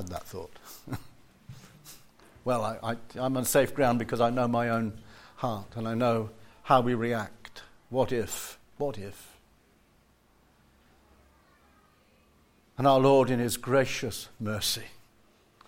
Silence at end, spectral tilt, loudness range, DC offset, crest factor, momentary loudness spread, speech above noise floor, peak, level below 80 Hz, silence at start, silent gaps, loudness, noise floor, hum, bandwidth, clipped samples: 0.7 s; -5 dB/octave; 9 LU; under 0.1%; 22 dB; 23 LU; 36 dB; -8 dBFS; -56 dBFS; 0 s; none; -28 LUFS; -64 dBFS; none; 16.5 kHz; under 0.1%